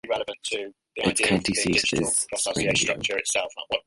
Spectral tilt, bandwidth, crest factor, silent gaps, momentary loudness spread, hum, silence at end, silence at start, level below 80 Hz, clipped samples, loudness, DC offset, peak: -2.5 dB/octave; 11.5 kHz; 18 dB; none; 8 LU; none; 0.05 s; 0.05 s; -52 dBFS; under 0.1%; -24 LUFS; under 0.1%; -8 dBFS